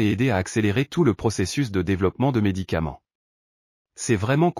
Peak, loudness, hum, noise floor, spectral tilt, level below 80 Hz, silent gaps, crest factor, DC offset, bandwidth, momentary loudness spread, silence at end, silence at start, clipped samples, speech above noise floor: -6 dBFS; -23 LUFS; none; under -90 dBFS; -6 dB/octave; -46 dBFS; 3.15-3.85 s; 16 dB; under 0.1%; 14.5 kHz; 6 LU; 0 s; 0 s; under 0.1%; over 68 dB